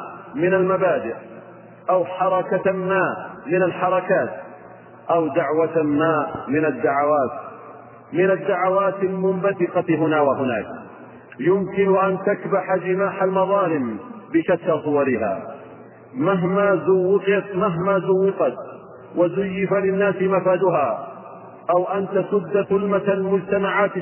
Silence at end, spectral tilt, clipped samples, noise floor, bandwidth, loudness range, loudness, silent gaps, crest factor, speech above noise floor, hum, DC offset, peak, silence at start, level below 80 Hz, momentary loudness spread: 0 s; -11 dB/octave; under 0.1%; -43 dBFS; 3.2 kHz; 2 LU; -20 LUFS; none; 14 dB; 23 dB; none; under 0.1%; -6 dBFS; 0 s; -62 dBFS; 14 LU